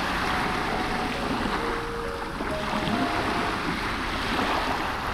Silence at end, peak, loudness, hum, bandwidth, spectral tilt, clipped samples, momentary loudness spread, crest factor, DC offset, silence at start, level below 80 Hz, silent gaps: 0 s; -12 dBFS; -27 LUFS; none; 17.5 kHz; -4.5 dB/octave; under 0.1%; 5 LU; 16 dB; under 0.1%; 0 s; -40 dBFS; none